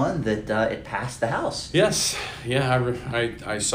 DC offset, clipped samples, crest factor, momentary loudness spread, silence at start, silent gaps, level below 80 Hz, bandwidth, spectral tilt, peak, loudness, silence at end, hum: under 0.1%; under 0.1%; 18 dB; 7 LU; 0 s; none; -46 dBFS; 16 kHz; -4 dB/octave; -6 dBFS; -24 LUFS; 0 s; none